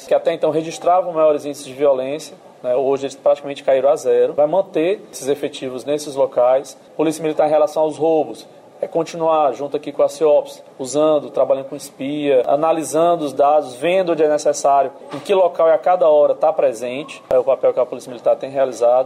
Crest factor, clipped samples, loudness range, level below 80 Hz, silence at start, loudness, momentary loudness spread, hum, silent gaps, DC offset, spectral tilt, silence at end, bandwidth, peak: 12 dB; under 0.1%; 3 LU; -66 dBFS; 0 s; -17 LUFS; 11 LU; none; none; under 0.1%; -4.5 dB/octave; 0 s; 14 kHz; -6 dBFS